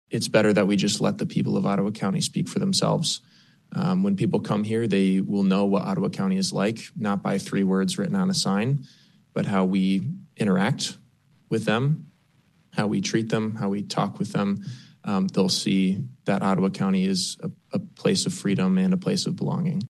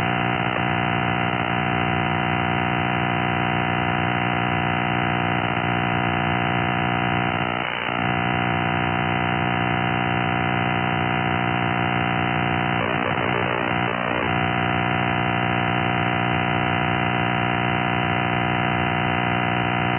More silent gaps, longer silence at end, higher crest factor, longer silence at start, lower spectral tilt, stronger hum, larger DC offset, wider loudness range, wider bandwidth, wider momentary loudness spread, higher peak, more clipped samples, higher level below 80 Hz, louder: neither; about the same, 0 s vs 0 s; about the same, 18 dB vs 14 dB; about the same, 0.1 s vs 0 s; second, -5.5 dB/octave vs -9 dB/octave; neither; neither; about the same, 3 LU vs 1 LU; first, 12.5 kHz vs 3.7 kHz; first, 7 LU vs 1 LU; about the same, -6 dBFS vs -8 dBFS; neither; second, -68 dBFS vs -48 dBFS; about the same, -24 LUFS vs -22 LUFS